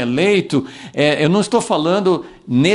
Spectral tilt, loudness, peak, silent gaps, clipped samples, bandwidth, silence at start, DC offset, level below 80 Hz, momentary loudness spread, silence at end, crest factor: -5.5 dB/octave; -16 LUFS; 0 dBFS; none; under 0.1%; 11.5 kHz; 0 s; under 0.1%; -54 dBFS; 6 LU; 0 s; 16 dB